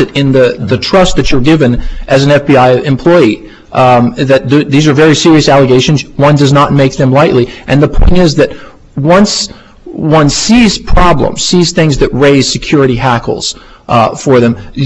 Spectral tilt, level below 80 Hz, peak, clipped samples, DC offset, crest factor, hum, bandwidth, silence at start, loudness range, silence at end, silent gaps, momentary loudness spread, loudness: -5.5 dB/octave; -20 dBFS; 0 dBFS; 0.5%; under 0.1%; 6 dB; none; 10 kHz; 0 s; 3 LU; 0 s; none; 7 LU; -8 LUFS